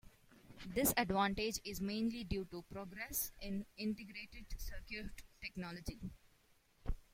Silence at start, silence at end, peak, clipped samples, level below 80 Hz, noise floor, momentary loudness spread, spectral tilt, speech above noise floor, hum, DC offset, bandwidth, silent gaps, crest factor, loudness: 0.05 s; 0.1 s; -20 dBFS; under 0.1%; -52 dBFS; -72 dBFS; 16 LU; -4 dB/octave; 30 dB; none; under 0.1%; 16.5 kHz; none; 22 dB; -41 LUFS